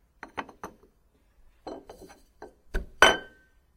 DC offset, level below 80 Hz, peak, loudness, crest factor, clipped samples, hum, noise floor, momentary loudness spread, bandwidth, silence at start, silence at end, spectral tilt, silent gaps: under 0.1%; -46 dBFS; 0 dBFS; -24 LUFS; 32 dB; under 0.1%; none; -65 dBFS; 26 LU; 16 kHz; 0.35 s; 0.55 s; -1.5 dB/octave; none